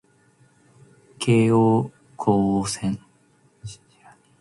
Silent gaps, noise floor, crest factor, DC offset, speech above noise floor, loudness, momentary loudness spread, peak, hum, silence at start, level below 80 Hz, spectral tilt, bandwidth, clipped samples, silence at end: none; -60 dBFS; 18 dB; under 0.1%; 40 dB; -21 LUFS; 23 LU; -6 dBFS; none; 1.2 s; -54 dBFS; -6.5 dB/octave; 11.5 kHz; under 0.1%; 0.65 s